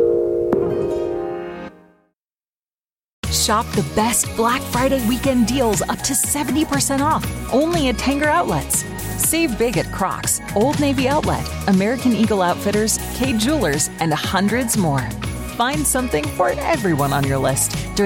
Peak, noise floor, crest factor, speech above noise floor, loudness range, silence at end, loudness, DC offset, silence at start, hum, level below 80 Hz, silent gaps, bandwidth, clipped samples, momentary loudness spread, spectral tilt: -2 dBFS; under -90 dBFS; 18 dB; over 72 dB; 3 LU; 0 s; -19 LUFS; under 0.1%; 0 s; none; -36 dBFS; 3.13-3.23 s; 17 kHz; under 0.1%; 5 LU; -4 dB/octave